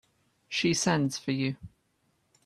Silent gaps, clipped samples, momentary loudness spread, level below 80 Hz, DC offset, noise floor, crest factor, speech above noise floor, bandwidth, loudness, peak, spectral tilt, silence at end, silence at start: none; under 0.1%; 8 LU; -64 dBFS; under 0.1%; -73 dBFS; 20 dB; 44 dB; 13.5 kHz; -29 LUFS; -12 dBFS; -4 dB/octave; 0.8 s; 0.5 s